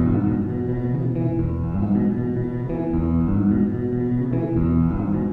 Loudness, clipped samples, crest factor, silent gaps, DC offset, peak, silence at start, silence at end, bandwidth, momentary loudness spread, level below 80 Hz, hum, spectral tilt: -22 LUFS; under 0.1%; 12 dB; none; under 0.1%; -8 dBFS; 0 s; 0 s; 4 kHz; 5 LU; -34 dBFS; none; -12.5 dB/octave